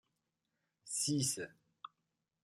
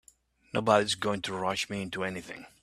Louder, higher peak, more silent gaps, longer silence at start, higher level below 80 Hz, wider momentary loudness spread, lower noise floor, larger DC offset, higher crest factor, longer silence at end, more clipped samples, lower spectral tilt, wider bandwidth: second, -37 LUFS vs -30 LUFS; second, -24 dBFS vs -8 dBFS; neither; first, 0.85 s vs 0.55 s; second, -80 dBFS vs -66 dBFS; first, 22 LU vs 10 LU; first, -87 dBFS vs -63 dBFS; neither; about the same, 20 dB vs 24 dB; first, 0.55 s vs 0.15 s; neither; about the same, -3 dB/octave vs -4 dB/octave; first, 16 kHz vs 14 kHz